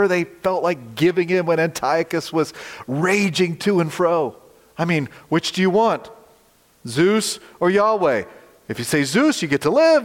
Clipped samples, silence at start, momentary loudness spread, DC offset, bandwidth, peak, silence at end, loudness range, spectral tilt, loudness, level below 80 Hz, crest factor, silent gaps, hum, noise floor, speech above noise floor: under 0.1%; 0 s; 10 LU; under 0.1%; 16.5 kHz; -6 dBFS; 0 s; 2 LU; -5 dB/octave; -20 LUFS; -60 dBFS; 14 dB; none; none; -56 dBFS; 37 dB